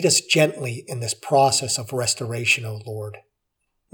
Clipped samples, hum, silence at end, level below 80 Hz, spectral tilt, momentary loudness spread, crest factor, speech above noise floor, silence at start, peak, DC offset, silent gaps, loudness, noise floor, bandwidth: under 0.1%; none; 0.75 s; -68 dBFS; -3 dB/octave; 15 LU; 18 dB; 54 dB; 0 s; -4 dBFS; under 0.1%; none; -21 LUFS; -76 dBFS; over 20 kHz